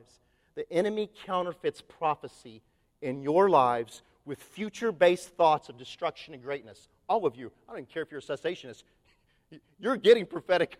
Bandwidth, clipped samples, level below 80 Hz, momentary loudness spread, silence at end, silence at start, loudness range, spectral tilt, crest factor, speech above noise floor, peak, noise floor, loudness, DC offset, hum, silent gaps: 13.5 kHz; under 0.1%; -70 dBFS; 21 LU; 0.05 s; 0.55 s; 8 LU; -5.5 dB/octave; 22 dB; 39 dB; -8 dBFS; -68 dBFS; -29 LUFS; under 0.1%; none; none